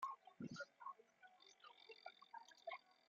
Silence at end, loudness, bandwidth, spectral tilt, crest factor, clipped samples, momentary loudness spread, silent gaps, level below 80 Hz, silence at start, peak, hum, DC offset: 0.15 s; -58 LUFS; 7.4 kHz; -3 dB/octave; 20 dB; under 0.1%; 12 LU; none; under -90 dBFS; 0 s; -38 dBFS; none; under 0.1%